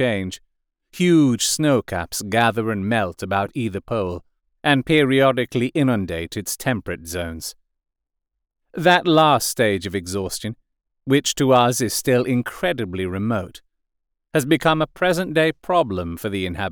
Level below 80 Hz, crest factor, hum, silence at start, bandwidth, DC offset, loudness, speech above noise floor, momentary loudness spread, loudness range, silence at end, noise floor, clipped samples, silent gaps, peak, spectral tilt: -50 dBFS; 16 dB; none; 0 s; over 20 kHz; under 0.1%; -20 LUFS; 59 dB; 12 LU; 3 LU; 0 s; -79 dBFS; under 0.1%; none; -4 dBFS; -4.5 dB/octave